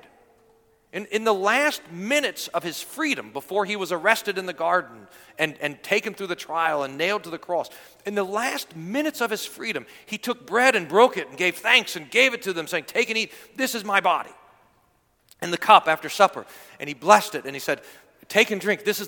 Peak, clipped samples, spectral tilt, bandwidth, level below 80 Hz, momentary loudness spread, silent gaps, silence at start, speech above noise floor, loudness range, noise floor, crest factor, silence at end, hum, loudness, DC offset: 0 dBFS; under 0.1%; -2.5 dB/octave; 19 kHz; -72 dBFS; 13 LU; none; 0.95 s; 41 dB; 6 LU; -65 dBFS; 24 dB; 0 s; none; -23 LUFS; under 0.1%